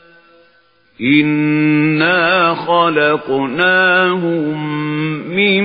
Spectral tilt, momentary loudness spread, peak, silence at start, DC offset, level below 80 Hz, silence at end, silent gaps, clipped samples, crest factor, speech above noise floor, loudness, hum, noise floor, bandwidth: -9 dB/octave; 8 LU; 0 dBFS; 1 s; under 0.1%; -60 dBFS; 0 s; none; under 0.1%; 14 dB; 40 dB; -14 LUFS; none; -53 dBFS; 5.2 kHz